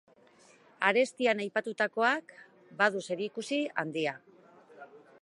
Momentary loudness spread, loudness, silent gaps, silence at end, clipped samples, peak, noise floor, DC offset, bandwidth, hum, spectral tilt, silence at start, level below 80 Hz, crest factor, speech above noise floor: 8 LU; -30 LUFS; none; 0.25 s; under 0.1%; -10 dBFS; -61 dBFS; under 0.1%; 11.5 kHz; none; -4 dB/octave; 0.8 s; -86 dBFS; 24 dB; 30 dB